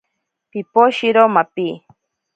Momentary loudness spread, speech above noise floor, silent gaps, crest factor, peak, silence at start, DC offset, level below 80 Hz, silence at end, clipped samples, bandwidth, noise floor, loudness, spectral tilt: 17 LU; 60 dB; none; 18 dB; 0 dBFS; 0.55 s; under 0.1%; -70 dBFS; 0.6 s; under 0.1%; 8.8 kHz; -75 dBFS; -15 LUFS; -6 dB/octave